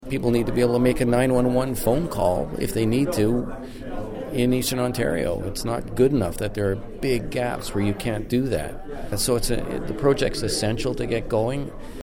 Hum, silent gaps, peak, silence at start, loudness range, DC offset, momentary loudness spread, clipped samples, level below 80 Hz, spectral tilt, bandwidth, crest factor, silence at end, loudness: none; none; -6 dBFS; 0 s; 3 LU; under 0.1%; 9 LU; under 0.1%; -36 dBFS; -5.5 dB/octave; 17 kHz; 18 dB; 0 s; -24 LUFS